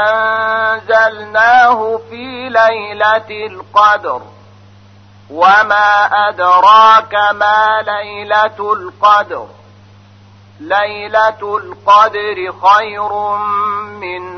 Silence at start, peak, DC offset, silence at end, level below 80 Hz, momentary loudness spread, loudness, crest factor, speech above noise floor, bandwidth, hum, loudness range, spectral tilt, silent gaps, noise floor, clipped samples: 0 s; 0 dBFS; 0.1%; 0 s; -56 dBFS; 14 LU; -11 LUFS; 12 dB; 30 dB; 6.6 kHz; none; 6 LU; -3.5 dB/octave; none; -41 dBFS; under 0.1%